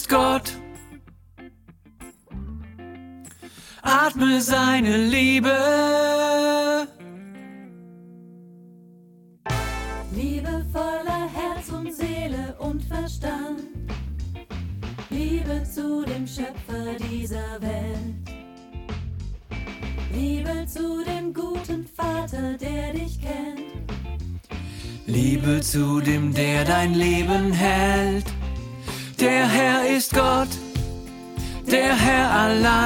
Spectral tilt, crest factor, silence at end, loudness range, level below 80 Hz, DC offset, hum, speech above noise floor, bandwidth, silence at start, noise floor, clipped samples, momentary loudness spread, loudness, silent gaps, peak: -5 dB/octave; 20 dB; 0 s; 11 LU; -36 dBFS; under 0.1%; none; 30 dB; 17.5 kHz; 0 s; -51 dBFS; under 0.1%; 19 LU; -23 LUFS; none; -4 dBFS